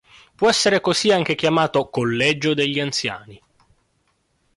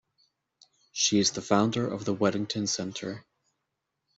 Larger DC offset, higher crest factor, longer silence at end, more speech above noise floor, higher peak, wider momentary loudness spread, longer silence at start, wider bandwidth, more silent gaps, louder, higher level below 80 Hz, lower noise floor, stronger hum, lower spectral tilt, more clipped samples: neither; second, 16 dB vs 22 dB; first, 1.2 s vs 0.95 s; second, 47 dB vs 55 dB; about the same, -6 dBFS vs -8 dBFS; second, 6 LU vs 14 LU; second, 0.4 s vs 0.95 s; first, 11.5 kHz vs 8 kHz; neither; first, -19 LUFS vs -27 LUFS; first, -58 dBFS vs -68 dBFS; second, -67 dBFS vs -83 dBFS; neither; about the same, -4 dB/octave vs -3.5 dB/octave; neither